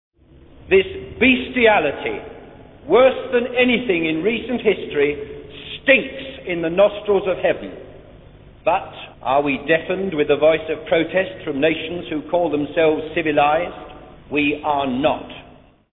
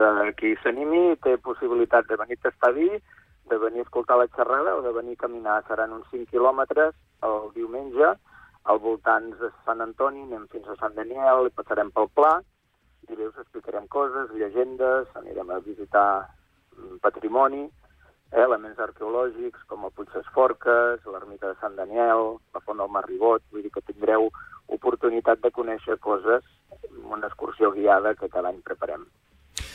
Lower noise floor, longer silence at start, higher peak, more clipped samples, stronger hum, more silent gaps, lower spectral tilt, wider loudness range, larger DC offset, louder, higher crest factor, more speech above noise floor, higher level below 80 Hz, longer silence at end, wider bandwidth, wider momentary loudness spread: second, -47 dBFS vs -59 dBFS; first, 0.65 s vs 0 s; first, -2 dBFS vs -8 dBFS; neither; neither; neither; first, -9 dB/octave vs -5 dB/octave; about the same, 3 LU vs 3 LU; neither; first, -19 LUFS vs -24 LUFS; about the same, 18 dB vs 16 dB; second, 29 dB vs 35 dB; first, -48 dBFS vs -58 dBFS; first, 0.45 s vs 0 s; second, 4.1 kHz vs 11 kHz; about the same, 14 LU vs 15 LU